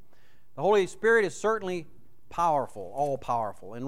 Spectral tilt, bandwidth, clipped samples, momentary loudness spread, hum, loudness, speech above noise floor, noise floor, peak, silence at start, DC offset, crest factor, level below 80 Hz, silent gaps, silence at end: -5 dB/octave; 13 kHz; under 0.1%; 13 LU; none; -27 LUFS; 37 dB; -64 dBFS; -12 dBFS; 0.55 s; 0.8%; 16 dB; -60 dBFS; none; 0 s